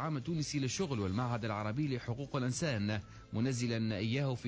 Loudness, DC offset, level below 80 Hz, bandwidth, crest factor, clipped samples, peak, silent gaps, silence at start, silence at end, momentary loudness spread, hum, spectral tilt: -36 LUFS; under 0.1%; -58 dBFS; 8 kHz; 12 dB; under 0.1%; -24 dBFS; none; 0 s; 0 s; 4 LU; none; -5.5 dB/octave